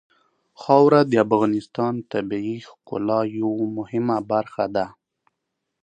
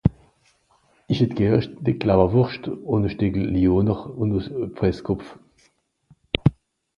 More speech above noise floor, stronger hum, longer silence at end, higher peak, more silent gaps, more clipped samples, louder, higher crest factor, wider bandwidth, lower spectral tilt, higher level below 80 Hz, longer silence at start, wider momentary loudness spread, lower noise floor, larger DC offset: first, 59 dB vs 43 dB; neither; first, 0.95 s vs 0.45 s; about the same, -2 dBFS vs 0 dBFS; neither; neither; about the same, -21 LUFS vs -22 LUFS; about the same, 20 dB vs 22 dB; first, 9 kHz vs 6.8 kHz; about the same, -8 dB/octave vs -9 dB/octave; second, -64 dBFS vs -40 dBFS; first, 0.6 s vs 0.05 s; first, 13 LU vs 10 LU; first, -79 dBFS vs -64 dBFS; neither